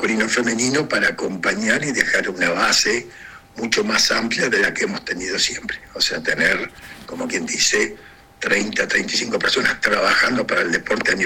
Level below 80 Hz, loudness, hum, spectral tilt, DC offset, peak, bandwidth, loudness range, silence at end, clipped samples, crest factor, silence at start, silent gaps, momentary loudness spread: -50 dBFS; -18 LUFS; none; -2 dB/octave; under 0.1%; 0 dBFS; 17 kHz; 2 LU; 0 s; under 0.1%; 20 dB; 0 s; none; 9 LU